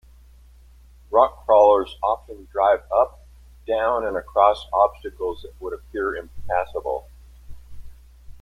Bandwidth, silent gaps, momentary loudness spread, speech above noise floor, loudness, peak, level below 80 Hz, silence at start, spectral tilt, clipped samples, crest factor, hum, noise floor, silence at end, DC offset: 13 kHz; none; 15 LU; 28 dB; -21 LUFS; -2 dBFS; -44 dBFS; 1.1 s; -6 dB/octave; under 0.1%; 20 dB; none; -49 dBFS; 0.05 s; under 0.1%